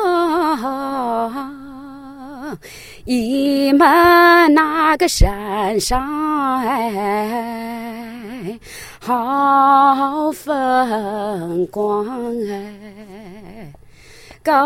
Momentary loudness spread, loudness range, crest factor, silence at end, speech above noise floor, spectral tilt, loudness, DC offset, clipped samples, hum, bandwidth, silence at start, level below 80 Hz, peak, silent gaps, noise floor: 23 LU; 9 LU; 16 dB; 0 s; 27 dB; -4.5 dB/octave; -16 LUFS; under 0.1%; under 0.1%; none; 16.5 kHz; 0 s; -32 dBFS; 0 dBFS; none; -42 dBFS